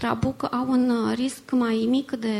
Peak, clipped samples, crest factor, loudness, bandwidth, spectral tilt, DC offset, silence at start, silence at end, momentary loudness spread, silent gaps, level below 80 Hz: -10 dBFS; under 0.1%; 14 dB; -24 LUFS; 13.5 kHz; -6 dB/octave; under 0.1%; 0 s; 0 s; 4 LU; none; -54 dBFS